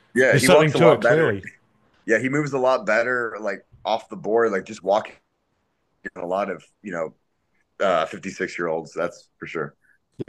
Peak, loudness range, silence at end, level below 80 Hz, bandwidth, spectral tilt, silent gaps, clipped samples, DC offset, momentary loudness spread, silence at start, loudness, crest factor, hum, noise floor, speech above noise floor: -2 dBFS; 9 LU; 0.05 s; -62 dBFS; 12.5 kHz; -5 dB/octave; none; under 0.1%; under 0.1%; 18 LU; 0.15 s; -21 LUFS; 20 dB; none; -71 dBFS; 50 dB